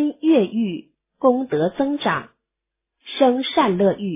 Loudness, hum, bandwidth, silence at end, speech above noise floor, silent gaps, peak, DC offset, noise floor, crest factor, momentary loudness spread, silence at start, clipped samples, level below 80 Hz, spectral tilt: -20 LUFS; none; 3.9 kHz; 0 s; 64 dB; none; -4 dBFS; under 0.1%; -83 dBFS; 18 dB; 9 LU; 0 s; under 0.1%; -64 dBFS; -10.5 dB/octave